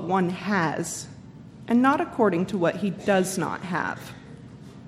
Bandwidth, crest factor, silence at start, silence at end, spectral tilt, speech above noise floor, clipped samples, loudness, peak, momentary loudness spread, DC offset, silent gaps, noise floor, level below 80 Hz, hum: 15.5 kHz; 18 dB; 0 s; 0 s; -5.5 dB/octave; 20 dB; under 0.1%; -25 LUFS; -8 dBFS; 22 LU; under 0.1%; none; -44 dBFS; -60 dBFS; none